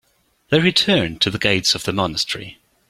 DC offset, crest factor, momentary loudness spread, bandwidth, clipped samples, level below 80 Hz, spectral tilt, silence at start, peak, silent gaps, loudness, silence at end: under 0.1%; 18 dB; 9 LU; 16 kHz; under 0.1%; -48 dBFS; -4 dB/octave; 0.5 s; -2 dBFS; none; -18 LUFS; 0.35 s